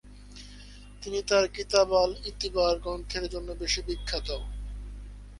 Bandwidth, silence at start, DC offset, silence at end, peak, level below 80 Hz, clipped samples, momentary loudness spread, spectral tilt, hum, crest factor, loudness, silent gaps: 11.5 kHz; 0.05 s; under 0.1%; 0 s; -6 dBFS; -40 dBFS; under 0.1%; 22 LU; -3.5 dB/octave; 50 Hz at -40 dBFS; 24 dB; -28 LUFS; none